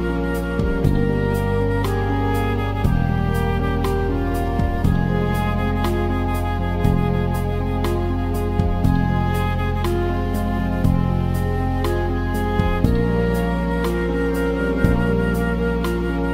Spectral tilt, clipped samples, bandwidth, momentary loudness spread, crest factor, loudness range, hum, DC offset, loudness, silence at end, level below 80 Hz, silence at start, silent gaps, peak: -7.5 dB/octave; under 0.1%; 16 kHz; 3 LU; 18 dB; 1 LU; none; 0.2%; -21 LUFS; 0 s; -26 dBFS; 0 s; none; 0 dBFS